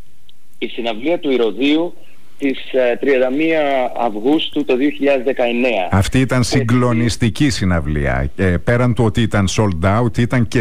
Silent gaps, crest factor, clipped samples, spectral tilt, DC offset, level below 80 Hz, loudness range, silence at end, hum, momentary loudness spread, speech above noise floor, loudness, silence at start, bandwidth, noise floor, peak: none; 12 dB; under 0.1%; -6 dB/octave; 6%; -34 dBFS; 2 LU; 0 s; none; 5 LU; 37 dB; -16 LUFS; 0.6 s; 15 kHz; -53 dBFS; -6 dBFS